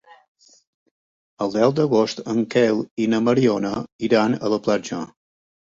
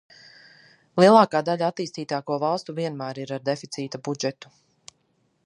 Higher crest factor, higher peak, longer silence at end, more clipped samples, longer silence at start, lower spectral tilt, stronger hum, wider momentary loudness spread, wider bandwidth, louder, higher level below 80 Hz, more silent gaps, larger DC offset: about the same, 18 dB vs 22 dB; about the same, -4 dBFS vs -2 dBFS; second, 0.55 s vs 1.15 s; neither; first, 1.4 s vs 0.95 s; about the same, -6 dB/octave vs -5.5 dB/octave; neither; second, 9 LU vs 16 LU; second, 7.8 kHz vs 11 kHz; about the same, -21 LUFS vs -23 LUFS; first, -60 dBFS vs -76 dBFS; first, 2.91-2.97 s, 3.92-3.99 s vs none; neither